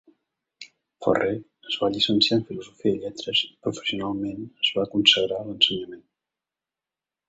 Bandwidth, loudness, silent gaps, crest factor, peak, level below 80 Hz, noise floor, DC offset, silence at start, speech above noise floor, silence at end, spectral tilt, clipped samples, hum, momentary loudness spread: 8 kHz; -23 LUFS; none; 24 dB; -2 dBFS; -62 dBFS; -90 dBFS; under 0.1%; 0.6 s; 65 dB; 1.3 s; -4 dB/octave; under 0.1%; none; 13 LU